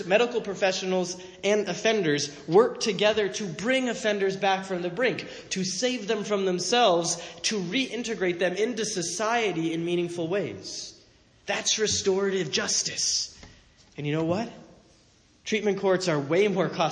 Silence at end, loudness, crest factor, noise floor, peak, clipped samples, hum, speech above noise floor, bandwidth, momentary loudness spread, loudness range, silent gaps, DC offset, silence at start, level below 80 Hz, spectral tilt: 0 s; -26 LUFS; 20 dB; -60 dBFS; -6 dBFS; under 0.1%; none; 34 dB; 10.5 kHz; 8 LU; 4 LU; none; under 0.1%; 0 s; -64 dBFS; -3.5 dB/octave